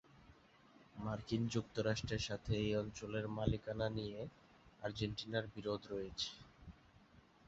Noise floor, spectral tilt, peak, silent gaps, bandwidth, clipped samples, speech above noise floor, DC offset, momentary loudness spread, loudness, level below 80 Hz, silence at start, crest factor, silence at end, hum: -66 dBFS; -5 dB/octave; -20 dBFS; none; 8 kHz; under 0.1%; 25 dB; under 0.1%; 12 LU; -42 LUFS; -58 dBFS; 0.15 s; 22 dB; 0.25 s; none